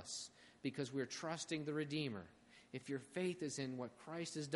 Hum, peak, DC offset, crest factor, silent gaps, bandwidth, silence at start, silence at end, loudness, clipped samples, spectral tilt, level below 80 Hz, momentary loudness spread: none; -26 dBFS; under 0.1%; 18 dB; none; 11.5 kHz; 0 s; 0 s; -45 LUFS; under 0.1%; -4.5 dB/octave; -82 dBFS; 11 LU